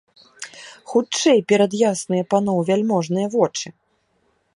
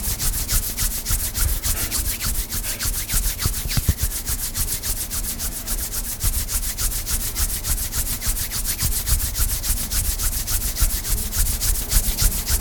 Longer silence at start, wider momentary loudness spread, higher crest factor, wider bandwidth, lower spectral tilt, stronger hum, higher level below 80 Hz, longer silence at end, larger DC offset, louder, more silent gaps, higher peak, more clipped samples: first, 0.4 s vs 0 s; first, 19 LU vs 3 LU; about the same, 18 dB vs 18 dB; second, 11.5 kHz vs 19.5 kHz; first, -5 dB/octave vs -2 dB/octave; neither; second, -66 dBFS vs -26 dBFS; first, 0.85 s vs 0 s; neither; first, -19 LUFS vs -22 LUFS; neither; about the same, -4 dBFS vs -4 dBFS; neither